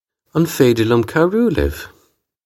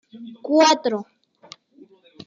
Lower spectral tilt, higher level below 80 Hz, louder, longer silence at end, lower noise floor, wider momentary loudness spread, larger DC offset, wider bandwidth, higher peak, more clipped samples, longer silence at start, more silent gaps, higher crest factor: first, -6.5 dB/octave vs -2.5 dB/octave; first, -34 dBFS vs -76 dBFS; first, -16 LUFS vs -19 LUFS; second, 0.55 s vs 1.25 s; first, -59 dBFS vs -52 dBFS; second, 11 LU vs 21 LU; neither; first, 17 kHz vs 7.6 kHz; first, 0 dBFS vs -4 dBFS; neither; first, 0.35 s vs 0.15 s; neither; about the same, 16 dB vs 20 dB